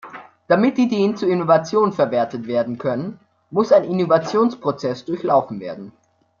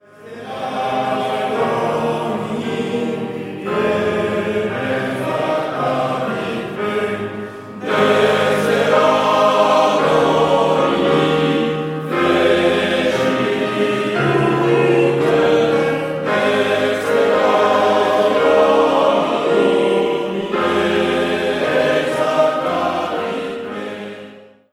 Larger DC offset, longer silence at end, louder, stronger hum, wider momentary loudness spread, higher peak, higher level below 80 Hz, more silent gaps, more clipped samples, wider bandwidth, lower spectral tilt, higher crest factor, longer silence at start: neither; first, 0.5 s vs 0.3 s; about the same, -19 LUFS vs -17 LUFS; neither; first, 12 LU vs 9 LU; about the same, -2 dBFS vs -2 dBFS; second, -64 dBFS vs -52 dBFS; neither; neither; second, 7.2 kHz vs 15.5 kHz; first, -7 dB/octave vs -5.5 dB/octave; about the same, 18 dB vs 14 dB; second, 0.05 s vs 0.2 s